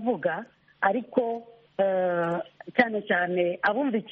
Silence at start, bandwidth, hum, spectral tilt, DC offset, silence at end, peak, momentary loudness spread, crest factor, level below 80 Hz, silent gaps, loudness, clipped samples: 0 s; 6 kHz; none; -4 dB/octave; under 0.1%; 0 s; -4 dBFS; 8 LU; 22 dB; -74 dBFS; none; -27 LUFS; under 0.1%